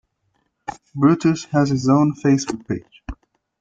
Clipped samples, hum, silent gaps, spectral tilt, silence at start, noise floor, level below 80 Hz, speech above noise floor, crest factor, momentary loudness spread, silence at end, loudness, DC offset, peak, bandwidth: under 0.1%; none; none; -6.5 dB/octave; 0.7 s; -69 dBFS; -46 dBFS; 51 dB; 16 dB; 20 LU; 0.45 s; -19 LUFS; under 0.1%; -4 dBFS; 7.8 kHz